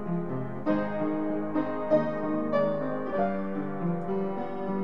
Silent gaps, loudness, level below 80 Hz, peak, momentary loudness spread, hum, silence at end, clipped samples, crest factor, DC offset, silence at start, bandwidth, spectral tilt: none; -30 LUFS; -60 dBFS; -12 dBFS; 6 LU; none; 0 s; under 0.1%; 18 dB; 1%; 0 s; 6 kHz; -10 dB/octave